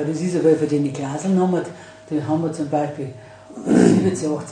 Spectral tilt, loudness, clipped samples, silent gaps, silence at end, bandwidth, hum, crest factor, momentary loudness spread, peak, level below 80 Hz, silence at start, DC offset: -7 dB/octave; -20 LUFS; under 0.1%; none; 0 s; 10 kHz; none; 18 dB; 16 LU; -2 dBFS; -60 dBFS; 0 s; under 0.1%